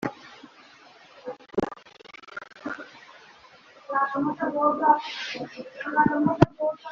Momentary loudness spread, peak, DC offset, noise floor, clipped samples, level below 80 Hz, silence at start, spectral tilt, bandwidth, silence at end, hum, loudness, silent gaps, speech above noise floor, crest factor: 23 LU; -2 dBFS; under 0.1%; -52 dBFS; under 0.1%; -56 dBFS; 0 s; -4.5 dB/octave; 7.4 kHz; 0 s; none; -26 LUFS; none; 28 dB; 26 dB